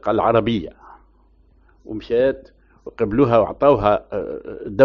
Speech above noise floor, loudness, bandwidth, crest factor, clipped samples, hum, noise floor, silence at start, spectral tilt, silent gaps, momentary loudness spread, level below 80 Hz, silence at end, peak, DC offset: 36 dB; -19 LUFS; 6.2 kHz; 18 dB; under 0.1%; none; -54 dBFS; 0.05 s; -6 dB/octave; none; 18 LU; -44 dBFS; 0 s; 0 dBFS; under 0.1%